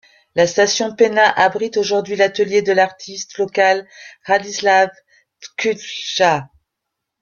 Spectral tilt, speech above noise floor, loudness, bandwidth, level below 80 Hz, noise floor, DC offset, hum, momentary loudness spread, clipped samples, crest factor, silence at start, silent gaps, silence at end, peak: -3 dB/octave; 62 dB; -16 LUFS; 7.2 kHz; -62 dBFS; -79 dBFS; under 0.1%; none; 10 LU; under 0.1%; 16 dB; 0.35 s; none; 0.75 s; 0 dBFS